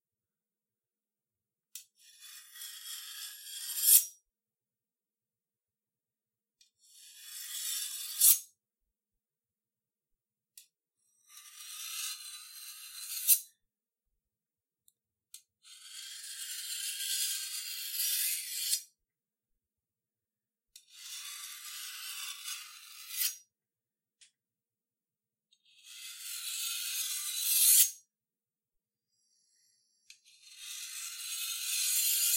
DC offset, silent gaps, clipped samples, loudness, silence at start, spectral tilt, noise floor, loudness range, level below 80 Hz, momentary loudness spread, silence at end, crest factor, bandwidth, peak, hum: under 0.1%; none; under 0.1%; -30 LUFS; 1.75 s; 9 dB/octave; under -90 dBFS; 17 LU; under -90 dBFS; 25 LU; 0 s; 30 dB; 16 kHz; -6 dBFS; none